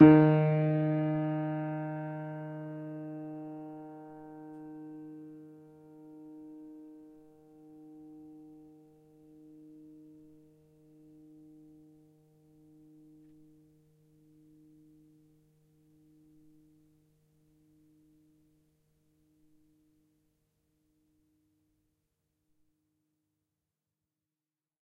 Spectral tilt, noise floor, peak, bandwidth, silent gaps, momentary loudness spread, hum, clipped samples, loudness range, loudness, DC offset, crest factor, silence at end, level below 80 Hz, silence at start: -11 dB/octave; under -90 dBFS; -6 dBFS; 4 kHz; none; 27 LU; none; under 0.1%; 26 LU; -31 LUFS; under 0.1%; 30 dB; 16.7 s; -70 dBFS; 0 s